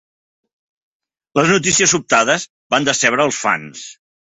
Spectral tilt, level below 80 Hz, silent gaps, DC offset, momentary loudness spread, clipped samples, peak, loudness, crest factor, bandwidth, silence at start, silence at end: -2.5 dB/octave; -56 dBFS; 2.50-2.70 s; under 0.1%; 11 LU; under 0.1%; 0 dBFS; -15 LUFS; 18 dB; 8.4 kHz; 1.35 s; 0.3 s